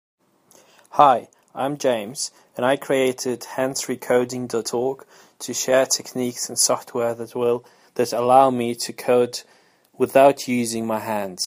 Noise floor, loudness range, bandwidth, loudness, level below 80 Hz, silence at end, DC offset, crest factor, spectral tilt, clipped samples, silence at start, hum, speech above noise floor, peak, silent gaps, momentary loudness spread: -55 dBFS; 4 LU; 15.5 kHz; -21 LUFS; -68 dBFS; 0 s; under 0.1%; 22 dB; -3.5 dB/octave; under 0.1%; 0.95 s; none; 34 dB; 0 dBFS; none; 12 LU